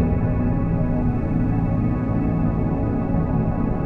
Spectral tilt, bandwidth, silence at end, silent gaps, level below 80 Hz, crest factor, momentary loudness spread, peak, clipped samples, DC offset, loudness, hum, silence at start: -12 dB/octave; 3.2 kHz; 0 s; none; -28 dBFS; 12 dB; 1 LU; -8 dBFS; under 0.1%; under 0.1%; -22 LUFS; none; 0 s